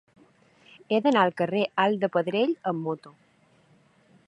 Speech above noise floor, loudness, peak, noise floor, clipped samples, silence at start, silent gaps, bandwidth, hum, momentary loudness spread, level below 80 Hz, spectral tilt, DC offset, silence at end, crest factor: 37 dB; -25 LUFS; -6 dBFS; -61 dBFS; under 0.1%; 0.9 s; none; 10.5 kHz; none; 9 LU; -78 dBFS; -7 dB/octave; under 0.1%; 1.2 s; 20 dB